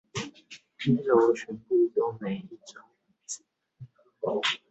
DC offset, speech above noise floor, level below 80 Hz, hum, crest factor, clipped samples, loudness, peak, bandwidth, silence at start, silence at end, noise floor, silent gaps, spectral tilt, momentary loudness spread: under 0.1%; 26 dB; -70 dBFS; none; 20 dB; under 0.1%; -27 LUFS; -10 dBFS; 8.2 kHz; 0.15 s; 0.15 s; -52 dBFS; none; -5 dB/octave; 24 LU